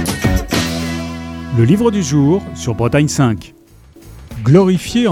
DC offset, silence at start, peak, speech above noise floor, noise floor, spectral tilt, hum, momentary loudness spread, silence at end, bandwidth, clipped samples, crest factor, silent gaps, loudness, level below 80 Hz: under 0.1%; 0 s; 0 dBFS; 29 dB; -41 dBFS; -6 dB/octave; none; 12 LU; 0 s; 16.5 kHz; under 0.1%; 14 dB; none; -15 LUFS; -32 dBFS